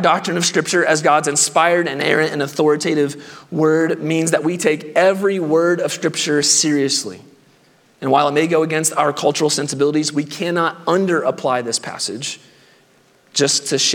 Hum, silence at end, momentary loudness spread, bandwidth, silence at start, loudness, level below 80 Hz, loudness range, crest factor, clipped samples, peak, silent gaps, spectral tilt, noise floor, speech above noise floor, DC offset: none; 0 s; 8 LU; 18 kHz; 0 s; -17 LUFS; -72 dBFS; 3 LU; 18 dB; under 0.1%; 0 dBFS; none; -3 dB/octave; -54 dBFS; 37 dB; under 0.1%